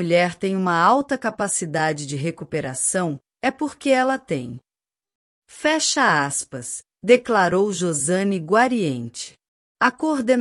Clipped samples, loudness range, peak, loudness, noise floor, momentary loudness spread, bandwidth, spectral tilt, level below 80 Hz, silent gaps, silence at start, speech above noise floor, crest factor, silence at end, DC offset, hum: under 0.1%; 4 LU; -2 dBFS; -21 LUFS; under -90 dBFS; 11 LU; 13.5 kHz; -4 dB/octave; -64 dBFS; 5.15-5.42 s, 9.48-9.75 s; 0 s; over 69 dB; 20 dB; 0 s; under 0.1%; none